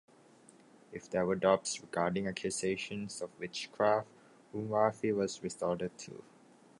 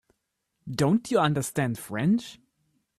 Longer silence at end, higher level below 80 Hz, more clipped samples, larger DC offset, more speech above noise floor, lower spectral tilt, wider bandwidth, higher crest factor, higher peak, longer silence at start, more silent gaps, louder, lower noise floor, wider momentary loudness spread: about the same, 0.6 s vs 0.65 s; second, -70 dBFS vs -62 dBFS; neither; neither; second, 27 dB vs 54 dB; second, -4.5 dB/octave vs -6 dB/octave; second, 11.5 kHz vs 14.5 kHz; about the same, 22 dB vs 18 dB; second, -14 dBFS vs -10 dBFS; first, 0.9 s vs 0.65 s; neither; second, -34 LUFS vs -26 LUFS; second, -61 dBFS vs -79 dBFS; first, 17 LU vs 14 LU